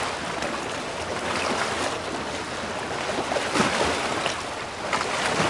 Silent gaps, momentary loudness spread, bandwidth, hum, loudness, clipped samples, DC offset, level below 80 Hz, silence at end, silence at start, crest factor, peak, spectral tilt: none; 7 LU; 11.5 kHz; none; -26 LUFS; under 0.1%; under 0.1%; -52 dBFS; 0 s; 0 s; 20 dB; -8 dBFS; -3 dB/octave